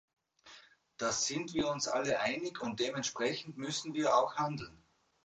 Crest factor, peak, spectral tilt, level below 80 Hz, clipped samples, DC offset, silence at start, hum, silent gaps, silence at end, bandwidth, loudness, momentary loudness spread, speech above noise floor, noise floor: 20 dB; -16 dBFS; -3 dB/octave; -68 dBFS; under 0.1%; under 0.1%; 0.45 s; none; none; 0.5 s; 9.4 kHz; -34 LUFS; 8 LU; 25 dB; -60 dBFS